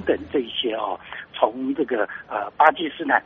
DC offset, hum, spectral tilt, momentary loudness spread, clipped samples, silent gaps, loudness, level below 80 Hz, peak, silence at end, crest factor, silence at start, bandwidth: under 0.1%; none; -1 dB/octave; 11 LU; under 0.1%; none; -23 LUFS; -58 dBFS; 0 dBFS; 0.05 s; 22 dB; 0 s; 5 kHz